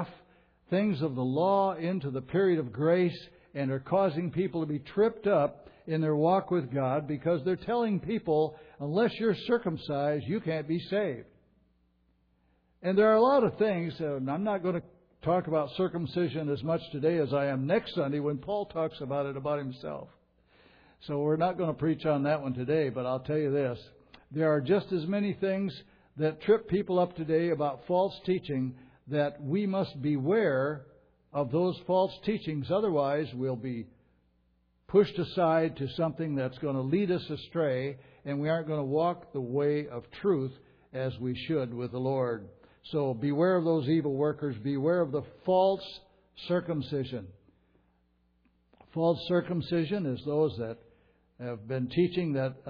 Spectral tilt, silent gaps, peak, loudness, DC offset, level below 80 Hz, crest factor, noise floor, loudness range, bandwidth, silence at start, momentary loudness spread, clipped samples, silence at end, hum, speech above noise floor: -10 dB/octave; none; -12 dBFS; -30 LUFS; under 0.1%; -64 dBFS; 18 dB; -70 dBFS; 4 LU; 5.4 kHz; 0 s; 10 LU; under 0.1%; 0 s; none; 41 dB